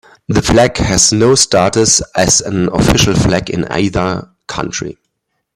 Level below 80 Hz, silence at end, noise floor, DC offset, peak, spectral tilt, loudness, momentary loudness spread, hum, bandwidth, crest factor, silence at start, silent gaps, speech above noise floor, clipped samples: -30 dBFS; 0.65 s; -70 dBFS; under 0.1%; 0 dBFS; -3.5 dB/octave; -12 LUFS; 12 LU; none; 16.5 kHz; 12 dB; 0.3 s; none; 58 dB; under 0.1%